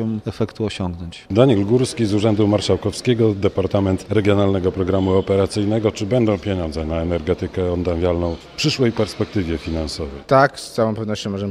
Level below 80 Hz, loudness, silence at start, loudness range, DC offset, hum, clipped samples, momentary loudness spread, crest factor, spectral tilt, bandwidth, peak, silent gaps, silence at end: -40 dBFS; -19 LUFS; 0 s; 3 LU; under 0.1%; none; under 0.1%; 8 LU; 18 dB; -6.5 dB/octave; 13.5 kHz; 0 dBFS; none; 0 s